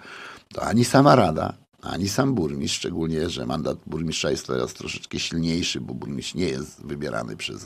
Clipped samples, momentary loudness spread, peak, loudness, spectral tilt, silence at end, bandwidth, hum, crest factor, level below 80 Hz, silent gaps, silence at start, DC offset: under 0.1%; 15 LU; -2 dBFS; -24 LUFS; -5 dB/octave; 0 s; 15.5 kHz; none; 22 dB; -48 dBFS; none; 0 s; under 0.1%